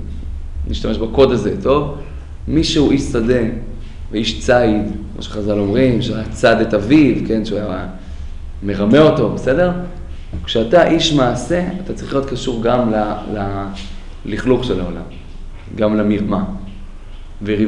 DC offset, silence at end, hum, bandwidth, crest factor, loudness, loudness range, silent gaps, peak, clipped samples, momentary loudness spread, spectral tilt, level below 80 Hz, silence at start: under 0.1%; 0 s; none; 11 kHz; 16 dB; -16 LUFS; 5 LU; none; 0 dBFS; under 0.1%; 19 LU; -6 dB/octave; -28 dBFS; 0 s